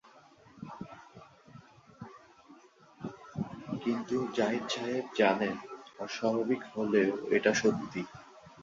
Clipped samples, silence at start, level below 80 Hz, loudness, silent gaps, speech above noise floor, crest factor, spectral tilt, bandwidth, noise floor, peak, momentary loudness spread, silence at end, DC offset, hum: under 0.1%; 0.55 s; -70 dBFS; -32 LUFS; none; 28 dB; 22 dB; -5 dB/octave; 7.6 kHz; -58 dBFS; -12 dBFS; 21 LU; 0 s; under 0.1%; none